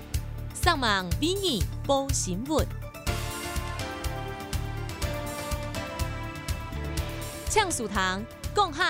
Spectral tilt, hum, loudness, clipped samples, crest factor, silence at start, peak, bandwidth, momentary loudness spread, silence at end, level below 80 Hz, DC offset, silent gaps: -4 dB/octave; none; -29 LUFS; under 0.1%; 20 dB; 0 s; -10 dBFS; 16 kHz; 9 LU; 0 s; -38 dBFS; under 0.1%; none